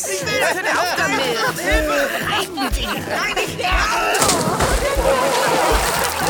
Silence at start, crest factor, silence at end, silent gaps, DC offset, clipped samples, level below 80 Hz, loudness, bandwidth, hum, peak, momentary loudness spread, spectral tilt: 0 s; 18 dB; 0 s; none; under 0.1%; under 0.1%; -30 dBFS; -18 LUFS; over 20 kHz; none; -2 dBFS; 5 LU; -2.5 dB/octave